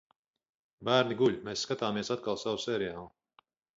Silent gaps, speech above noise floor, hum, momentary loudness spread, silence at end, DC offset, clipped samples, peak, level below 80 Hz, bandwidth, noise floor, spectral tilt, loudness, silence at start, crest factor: none; 37 dB; none; 9 LU; 0.7 s; under 0.1%; under 0.1%; -12 dBFS; -68 dBFS; 7.8 kHz; -68 dBFS; -4.5 dB/octave; -31 LUFS; 0.8 s; 22 dB